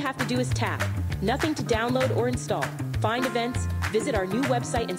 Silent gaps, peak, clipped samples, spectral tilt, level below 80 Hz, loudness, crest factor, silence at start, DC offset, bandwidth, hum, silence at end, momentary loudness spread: none; -10 dBFS; under 0.1%; -5.5 dB/octave; -42 dBFS; -26 LUFS; 16 dB; 0 s; under 0.1%; 16 kHz; none; 0 s; 4 LU